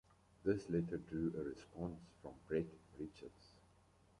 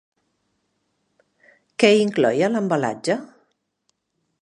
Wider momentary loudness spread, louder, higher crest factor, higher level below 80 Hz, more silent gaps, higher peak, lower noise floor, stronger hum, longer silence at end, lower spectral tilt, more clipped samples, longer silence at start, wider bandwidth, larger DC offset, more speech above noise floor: first, 16 LU vs 10 LU; second, -44 LUFS vs -20 LUFS; about the same, 22 dB vs 22 dB; first, -66 dBFS vs -74 dBFS; neither; second, -24 dBFS vs 0 dBFS; about the same, -71 dBFS vs -74 dBFS; neither; second, 0.7 s vs 1.15 s; first, -8 dB/octave vs -5 dB/octave; neither; second, 0.45 s vs 1.8 s; about the same, 11 kHz vs 11 kHz; neither; second, 27 dB vs 56 dB